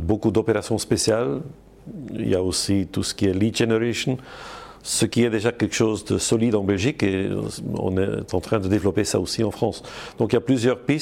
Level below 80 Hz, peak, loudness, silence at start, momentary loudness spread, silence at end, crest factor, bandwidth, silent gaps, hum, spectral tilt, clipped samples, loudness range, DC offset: -48 dBFS; -6 dBFS; -22 LUFS; 0 s; 11 LU; 0 s; 16 dB; 16.5 kHz; none; none; -5 dB/octave; under 0.1%; 2 LU; under 0.1%